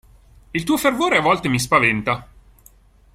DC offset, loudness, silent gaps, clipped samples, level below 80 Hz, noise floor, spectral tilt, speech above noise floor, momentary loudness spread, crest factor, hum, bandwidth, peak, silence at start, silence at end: under 0.1%; -18 LUFS; none; under 0.1%; -48 dBFS; -51 dBFS; -4.5 dB/octave; 33 dB; 10 LU; 20 dB; none; 16 kHz; -2 dBFS; 0.55 s; 0.9 s